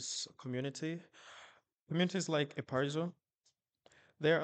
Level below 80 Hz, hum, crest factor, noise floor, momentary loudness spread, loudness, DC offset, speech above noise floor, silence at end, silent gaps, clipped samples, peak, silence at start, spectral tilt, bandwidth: -82 dBFS; none; 20 dB; -80 dBFS; 21 LU; -38 LUFS; under 0.1%; 42 dB; 0 s; 1.81-1.87 s; under 0.1%; -18 dBFS; 0 s; -4.5 dB/octave; 9.2 kHz